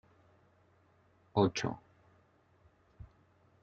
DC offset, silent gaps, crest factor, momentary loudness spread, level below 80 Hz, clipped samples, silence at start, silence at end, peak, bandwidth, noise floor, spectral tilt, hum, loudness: under 0.1%; none; 26 dB; 27 LU; -68 dBFS; under 0.1%; 1.35 s; 0.55 s; -14 dBFS; 7.2 kHz; -68 dBFS; -5.5 dB/octave; none; -34 LUFS